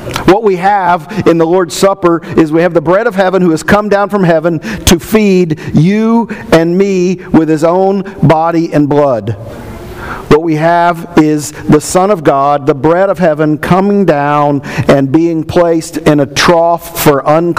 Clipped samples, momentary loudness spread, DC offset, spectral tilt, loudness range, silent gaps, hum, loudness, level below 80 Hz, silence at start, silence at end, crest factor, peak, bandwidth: 1%; 4 LU; 0.6%; -6 dB/octave; 2 LU; none; none; -9 LUFS; -34 dBFS; 0 s; 0 s; 8 dB; 0 dBFS; 16.5 kHz